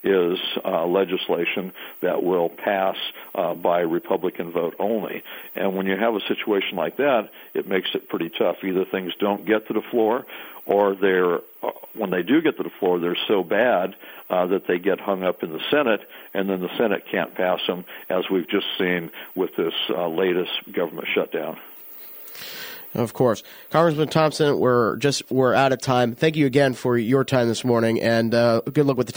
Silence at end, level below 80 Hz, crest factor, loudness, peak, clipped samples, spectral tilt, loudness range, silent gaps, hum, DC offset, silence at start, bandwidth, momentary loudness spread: 0 s; -66 dBFS; 18 dB; -22 LUFS; -4 dBFS; under 0.1%; -5.5 dB/octave; 5 LU; none; none; under 0.1%; 0 s; 19 kHz; 11 LU